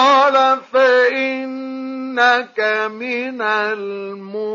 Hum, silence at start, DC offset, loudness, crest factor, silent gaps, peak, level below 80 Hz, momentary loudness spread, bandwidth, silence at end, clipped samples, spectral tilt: none; 0 s; under 0.1%; -17 LUFS; 14 dB; none; -2 dBFS; -82 dBFS; 14 LU; 7.4 kHz; 0 s; under 0.1%; -3.5 dB/octave